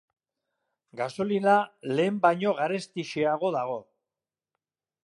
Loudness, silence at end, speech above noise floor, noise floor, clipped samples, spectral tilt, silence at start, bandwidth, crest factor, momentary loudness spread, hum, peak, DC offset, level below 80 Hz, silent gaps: -27 LUFS; 1.25 s; over 64 dB; under -90 dBFS; under 0.1%; -6 dB/octave; 0.95 s; 11.5 kHz; 20 dB; 11 LU; none; -8 dBFS; under 0.1%; -76 dBFS; none